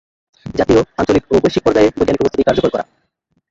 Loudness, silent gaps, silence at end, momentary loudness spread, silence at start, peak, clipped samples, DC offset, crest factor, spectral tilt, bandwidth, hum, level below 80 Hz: -15 LUFS; none; 0.7 s; 11 LU; 0.45 s; 0 dBFS; under 0.1%; under 0.1%; 14 dB; -6.5 dB/octave; 7.8 kHz; none; -38 dBFS